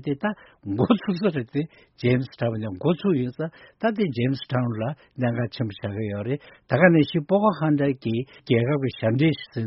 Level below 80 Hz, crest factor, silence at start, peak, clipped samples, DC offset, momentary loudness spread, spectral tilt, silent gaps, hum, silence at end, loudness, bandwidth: -58 dBFS; 22 dB; 0 s; -2 dBFS; under 0.1%; under 0.1%; 9 LU; -6.5 dB/octave; none; none; 0 s; -24 LUFS; 5.8 kHz